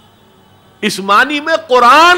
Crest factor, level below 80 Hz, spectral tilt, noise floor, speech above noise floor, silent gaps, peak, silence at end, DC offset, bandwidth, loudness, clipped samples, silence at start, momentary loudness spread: 10 dB; -50 dBFS; -2.5 dB/octave; -46 dBFS; 37 dB; none; 0 dBFS; 0 s; under 0.1%; 16.5 kHz; -10 LUFS; under 0.1%; 0.8 s; 12 LU